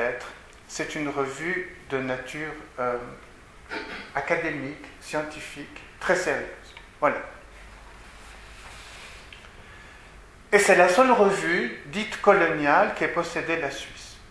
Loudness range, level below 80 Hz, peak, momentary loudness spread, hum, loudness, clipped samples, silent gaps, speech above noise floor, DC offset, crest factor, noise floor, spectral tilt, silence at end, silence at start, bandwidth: 13 LU; -52 dBFS; -2 dBFS; 25 LU; none; -24 LUFS; under 0.1%; none; 23 dB; under 0.1%; 26 dB; -48 dBFS; -4 dB/octave; 0 s; 0 s; 11 kHz